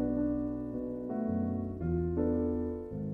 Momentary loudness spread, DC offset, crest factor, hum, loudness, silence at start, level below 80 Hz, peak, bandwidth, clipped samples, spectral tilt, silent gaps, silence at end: 6 LU; under 0.1%; 14 dB; none; -34 LUFS; 0 s; -46 dBFS; -20 dBFS; 2.7 kHz; under 0.1%; -12.5 dB/octave; none; 0 s